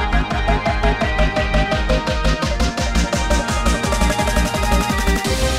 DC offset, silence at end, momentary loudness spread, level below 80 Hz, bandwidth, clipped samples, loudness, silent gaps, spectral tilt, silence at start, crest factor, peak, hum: 0.3%; 0 s; 2 LU; -20 dBFS; 15.5 kHz; under 0.1%; -18 LUFS; none; -4.5 dB/octave; 0 s; 14 dB; -2 dBFS; none